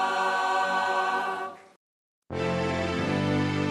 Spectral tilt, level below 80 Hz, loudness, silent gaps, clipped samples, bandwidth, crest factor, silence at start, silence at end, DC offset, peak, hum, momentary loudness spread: -5.5 dB/octave; -56 dBFS; -27 LUFS; 1.76-2.22 s; under 0.1%; 13 kHz; 14 dB; 0 s; 0 s; under 0.1%; -14 dBFS; none; 7 LU